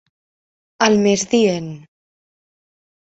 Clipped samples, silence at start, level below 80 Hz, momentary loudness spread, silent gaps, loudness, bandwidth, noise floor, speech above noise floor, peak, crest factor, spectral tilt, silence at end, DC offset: under 0.1%; 0.8 s; -60 dBFS; 11 LU; none; -16 LUFS; 8.2 kHz; under -90 dBFS; over 74 dB; -2 dBFS; 18 dB; -4.5 dB/octave; 1.25 s; under 0.1%